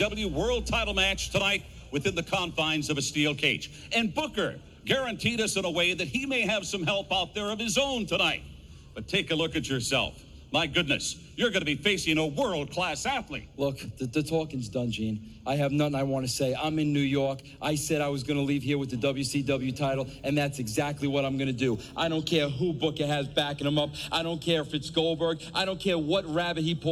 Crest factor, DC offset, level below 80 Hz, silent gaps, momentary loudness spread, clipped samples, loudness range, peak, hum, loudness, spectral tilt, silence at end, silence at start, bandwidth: 20 dB; under 0.1%; -48 dBFS; none; 6 LU; under 0.1%; 2 LU; -8 dBFS; none; -28 LUFS; -4 dB/octave; 0 s; 0 s; 17 kHz